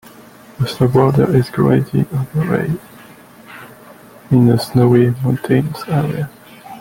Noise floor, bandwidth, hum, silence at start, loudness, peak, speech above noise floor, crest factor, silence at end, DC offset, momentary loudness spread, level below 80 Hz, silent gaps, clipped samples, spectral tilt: -41 dBFS; 17 kHz; none; 0.6 s; -15 LUFS; -2 dBFS; 27 dB; 14 dB; 0 s; under 0.1%; 13 LU; -46 dBFS; none; under 0.1%; -8 dB/octave